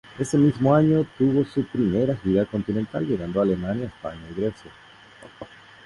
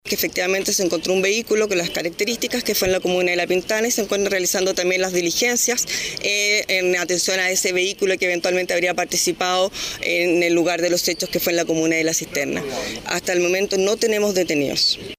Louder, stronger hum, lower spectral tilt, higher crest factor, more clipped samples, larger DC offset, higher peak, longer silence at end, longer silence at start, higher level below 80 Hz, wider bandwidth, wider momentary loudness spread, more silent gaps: second, -23 LUFS vs -19 LUFS; neither; first, -8 dB/octave vs -2 dB/octave; about the same, 16 dB vs 12 dB; neither; neither; about the same, -8 dBFS vs -8 dBFS; first, 0.4 s vs 0.05 s; about the same, 0.1 s vs 0.05 s; about the same, -50 dBFS vs -52 dBFS; second, 11.5 kHz vs 16 kHz; first, 15 LU vs 5 LU; neither